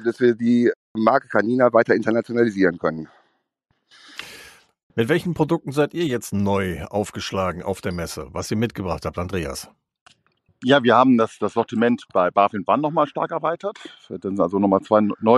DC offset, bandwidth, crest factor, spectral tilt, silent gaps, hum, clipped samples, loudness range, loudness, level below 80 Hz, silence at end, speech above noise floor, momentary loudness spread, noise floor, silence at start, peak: under 0.1%; 13.5 kHz; 20 dB; -6 dB/octave; 0.76-0.95 s, 4.83-4.90 s, 10.01-10.06 s; none; under 0.1%; 7 LU; -21 LUFS; -50 dBFS; 0 s; 51 dB; 13 LU; -71 dBFS; 0 s; -2 dBFS